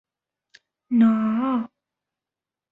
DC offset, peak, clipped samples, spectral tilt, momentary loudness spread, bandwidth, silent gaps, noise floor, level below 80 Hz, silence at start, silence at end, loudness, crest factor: under 0.1%; -8 dBFS; under 0.1%; -9 dB/octave; 9 LU; 4 kHz; none; -89 dBFS; -70 dBFS; 0.9 s; 1.05 s; -21 LUFS; 16 dB